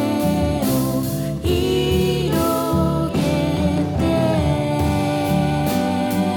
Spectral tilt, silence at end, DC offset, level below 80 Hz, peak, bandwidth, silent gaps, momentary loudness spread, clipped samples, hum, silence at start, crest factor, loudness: -6.5 dB/octave; 0 s; under 0.1%; -34 dBFS; -8 dBFS; 19 kHz; none; 2 LU; under 0.1%; none; 0 s; 10 dB; -19 LUFS